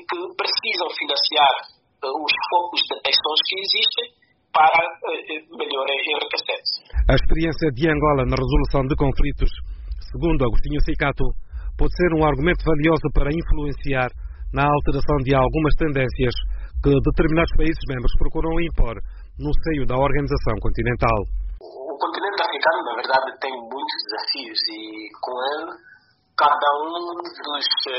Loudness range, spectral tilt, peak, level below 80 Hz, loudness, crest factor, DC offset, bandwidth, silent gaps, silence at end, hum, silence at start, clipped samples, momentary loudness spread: 5 LU; -3.5 dB/octave; -4 dBFS; -26 dBFS; -21 LUFS; 16 dB; under 0.1%; 6 kHz; none; 0 s; none; 0 s; under 0.1%; 12 LU